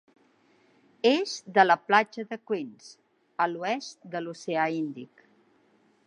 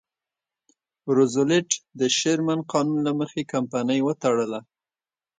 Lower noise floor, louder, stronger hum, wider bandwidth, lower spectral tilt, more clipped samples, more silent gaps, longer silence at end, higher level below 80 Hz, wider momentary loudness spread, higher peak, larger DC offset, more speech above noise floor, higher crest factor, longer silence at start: second, -65 dBFS vs under -90 dBFS; second, -27 LUFS vs -23 LUFS; neither; about the same, 10.5 kHz vs 9.6 kHz; about the same, -4 dB/octave vs -4.5 dB/octave; neither; neither; first, 1 s vs 0.8 s; second, -86 dBFS vs -70 dBFS; first, 15 LU vs 7 LU; about the same, -4 dBFS vs -6 dBFS; neither; second, 38 dB vs over 67 dB; about the same, 24 dB vs 20 dB; about the same, 1.05 s vs 1.05 s